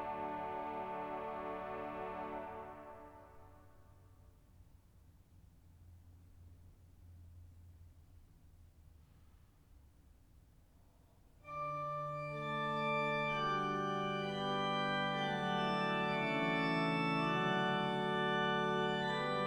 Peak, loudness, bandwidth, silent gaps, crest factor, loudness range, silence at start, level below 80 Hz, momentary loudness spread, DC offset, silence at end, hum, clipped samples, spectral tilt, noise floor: -24 dBFS; -37 LUFS; 19 kHz; none; 16 dB; 16 LU; 0 s; -66 dBFS; 15 LU; under 0.1%; 0 s; none; under 0.1%; -6 dB/octave; -66 dBFS